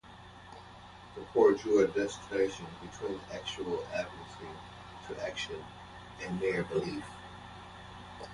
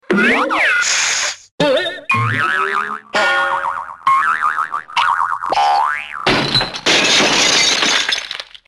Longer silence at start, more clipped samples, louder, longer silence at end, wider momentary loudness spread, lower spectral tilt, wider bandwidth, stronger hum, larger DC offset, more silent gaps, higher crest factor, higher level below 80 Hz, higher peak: about the same, 0.05 s vs 0.1 s; neither; second, -33 LUFS vs -14 LUFS; second, 0 s vs 0.25 s; first, 22 LU vs 9 LU; first, -5 dB/octave vs -2 dB/octave; second, 11.5 kHz vs 13 kHz; neither; neither; second, none vs 1.51-1.58 s; first, 22 dB vs 14 dB; second, -60 dBFS vs -48 dBFS; second, -12 dBFS vs -2 dBFS